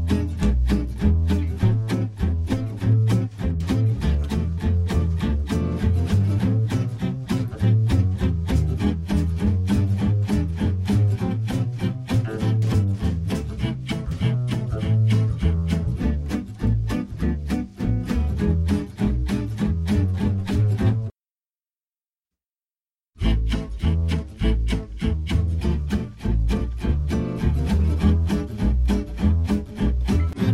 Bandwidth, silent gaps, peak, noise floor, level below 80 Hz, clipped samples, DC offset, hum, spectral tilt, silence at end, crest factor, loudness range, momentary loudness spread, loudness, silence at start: 12.5 kHz; none; -8 dBFS; under -90 dBFS; -28 dBFS; under 0.1%; under 0.1%; none; -8 dB/octave; 0 s; 14 dB; 3 LU; 6 LU; -23 LUFS; 0 s